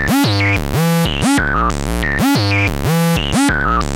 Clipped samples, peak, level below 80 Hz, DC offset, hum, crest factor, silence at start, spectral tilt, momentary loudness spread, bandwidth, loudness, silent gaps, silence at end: under 0.1%; -2 dBFS; -26 dBFS; under 0.1%; none; 12 dB; 0 s; -5 dB/octave; 3 LU; 17 kHz; -15 LUFS; none; 0 s